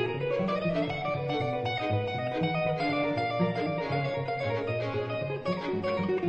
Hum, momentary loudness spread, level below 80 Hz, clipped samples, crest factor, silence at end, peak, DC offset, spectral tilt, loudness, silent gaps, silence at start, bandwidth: none; 3 LU; -58 dBFS; under 0.1%; 14 dB; 0 s; -14 dBFS; under 0.1%; -8 dB/octave; -30 LUFS; none; 0 s; 8.4 kHz